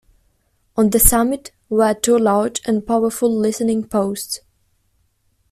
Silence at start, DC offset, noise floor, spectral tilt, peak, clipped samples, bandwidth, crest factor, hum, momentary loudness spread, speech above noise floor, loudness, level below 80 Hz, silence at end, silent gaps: 0.75 s; under 0.1%; -63 dBFS; -4 dB/octave; 0 dBFS; under 0.1%; 15.5 kHz; 18 dB; none; 13 LU; 47 dB; -17 LUFS; -34 dBFS; 1.15 s; none